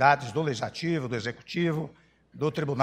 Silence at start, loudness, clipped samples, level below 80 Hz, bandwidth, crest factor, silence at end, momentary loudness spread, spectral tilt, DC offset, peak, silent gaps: 0 s; -29 LUFS; under 0.1%; -64 dBFS; 10.5 kHz; 22 dB; 0 s; 7 LU; -6 dB/octave; under 0.1%; -6 dBFS; none